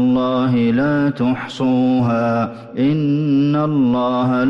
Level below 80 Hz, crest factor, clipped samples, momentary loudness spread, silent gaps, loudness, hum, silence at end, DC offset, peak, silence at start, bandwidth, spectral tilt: -52 dBFS; 8 dB; under 0.1%; 4 LU; none; -17 LUFS; none; 0 s; under 0.1%; -8 dBFS; 0 s; 7.4 kHz; -8.5 dB/octave